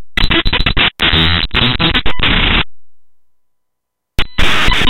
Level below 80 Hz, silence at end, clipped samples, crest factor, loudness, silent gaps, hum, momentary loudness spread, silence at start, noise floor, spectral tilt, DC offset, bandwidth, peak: -20 dBFS; 0 s; under 0.1%; 12 dB; -12 LUFS; none; none; 9 LU; 0 s; -76 dBFS; -4.5 dB/octave; under 0.1%; 15.5 kHz; 0 dBFS